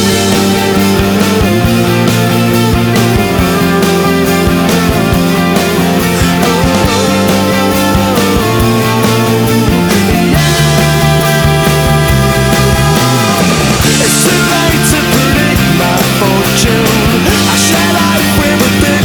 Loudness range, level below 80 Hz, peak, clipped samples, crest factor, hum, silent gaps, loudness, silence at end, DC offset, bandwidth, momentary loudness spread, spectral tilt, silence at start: 1 LU; -24 dBFS; 0 dBFS; under 0.1%; 8 dB; none; none; -9 LUFS; 0 s; under 0.1%; over 20 kHz; 2 LU; -4.5 dB/octave; 0 s